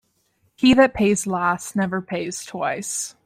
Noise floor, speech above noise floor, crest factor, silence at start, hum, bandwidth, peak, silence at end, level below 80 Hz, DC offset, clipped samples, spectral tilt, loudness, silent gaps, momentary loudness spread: -66 dBFS; 46 dB; 18 dB; 0.6 s; none; 15.5 kHz; -4 dBFS; 0.15 s; -50 dBFS; under 0.1%; under 0.1%; -4 dB/octave; -21 LUFS; none; 12 LU